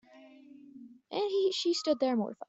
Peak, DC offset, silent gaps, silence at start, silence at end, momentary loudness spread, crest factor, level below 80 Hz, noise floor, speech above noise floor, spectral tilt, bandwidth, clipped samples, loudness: -16 dBFS; under 0.1%; none; 0.15 s; 0.05 s; 18 LU; 16 dB; -80 dBFS; -55 dBFS; 25 dB; -4 dB/octave; 8 kHz; under 0.1%; -31 LUFS